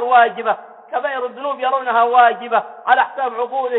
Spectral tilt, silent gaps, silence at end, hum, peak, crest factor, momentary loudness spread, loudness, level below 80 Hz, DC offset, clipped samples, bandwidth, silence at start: -6 dB/octave; none; 0 s; none; -2 dBFS; 16 dB; 10 LU; -17 LUFS; -76 dBFS; under 0.1%; under 0.1%; 4.1 kHz; 0 s